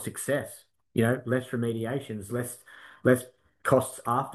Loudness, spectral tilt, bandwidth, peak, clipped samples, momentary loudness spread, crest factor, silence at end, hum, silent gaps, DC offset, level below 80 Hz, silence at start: -29 LUFS; -6 dB/octave; 13 kHz; -8 dBFS; under 0.1%; 18 LU; 22 dB; 0 s; none; none; under 0.1%; -66 dBFS; 0 s